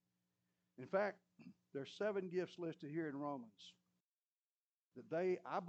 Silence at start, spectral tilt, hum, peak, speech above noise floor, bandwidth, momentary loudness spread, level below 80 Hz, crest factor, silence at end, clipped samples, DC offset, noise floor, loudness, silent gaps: 0.8 s; -7 dB/octave; none; -26 dBFS; over 46 dB; 8.2 kHz; 21 LU; under -90 dBFS; 20 dB; 0 s; under 0.1%; under 0.1%; under -90 dBFS; -44 LUFS; 4.00-4.85 s